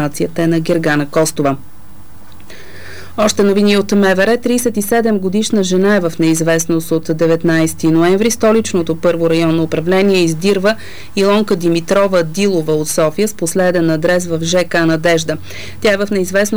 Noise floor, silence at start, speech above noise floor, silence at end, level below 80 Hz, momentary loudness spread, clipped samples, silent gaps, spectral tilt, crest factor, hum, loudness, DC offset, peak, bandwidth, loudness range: -38 dBFS; 0 s; 25 dB; 0 s; -46 dBFS; 5 LU; under 0.1%; none; -5 dB/octave; 10 dB; none; -14 LUFS; 5%; -4 dBFS; over 20 kHz; 2 LU